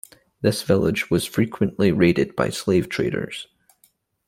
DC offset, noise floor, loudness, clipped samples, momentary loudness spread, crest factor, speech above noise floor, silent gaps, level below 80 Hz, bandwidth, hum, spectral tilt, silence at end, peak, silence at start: under 0.1%; -62 dBFS; -21 LUFS; under 0.1%; 9 LU; 18 dB; 42 dB; none; -52 dBFS; 16.5 kHz; none; -6 dB/octave; 0.85 s; -4 dBFS; 0.4 s